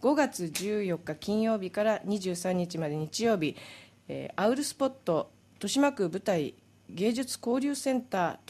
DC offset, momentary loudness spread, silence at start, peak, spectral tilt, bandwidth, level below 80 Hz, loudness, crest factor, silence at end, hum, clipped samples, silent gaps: under 0.1%; 11 LU; 0 s; -14 dBFS; -5 dB/octave; 15.5 kHz; -70 dBFS; -30 LUFS; 16 dB; 0.15 s; none; under 0.1%; none